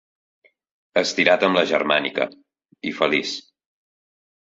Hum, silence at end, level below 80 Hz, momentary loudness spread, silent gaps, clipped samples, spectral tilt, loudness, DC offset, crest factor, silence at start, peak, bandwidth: none; 1.1 s; -66 dBFS; 13 LU; none; under 0.1%; -3.5 dB/octave; -20 LUFS; under 0.1%; 22 dB; 0.95 s; -2 dBFS; 7.8 kHz